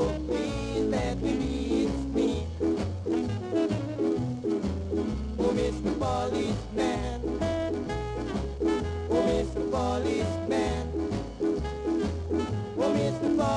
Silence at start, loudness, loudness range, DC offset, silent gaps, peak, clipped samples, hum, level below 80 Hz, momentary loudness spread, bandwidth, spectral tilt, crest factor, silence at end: 0 s; -29 LUFS; 1 LU; under 0.1%; none; -14 dBFS; under 0.1%; none; -40 dBFS; 4 LU; 11 kHz; -6.5 dB/octave; 14 dB; 0 s